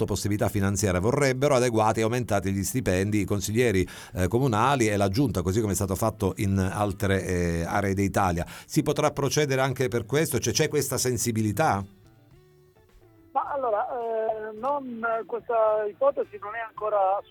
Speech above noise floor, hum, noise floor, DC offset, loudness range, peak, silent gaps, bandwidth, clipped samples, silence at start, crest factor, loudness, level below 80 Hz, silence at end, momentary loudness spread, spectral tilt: 32 dB; none; -57 dBFS; under 0.1%; 5 LU; -10 dBFS; none; 19 kHz; under 0.1%; 0 s; 16 dB; -26 LUFS; -48 dBFS; 0.1 s; 6 LU; -5 dB/octave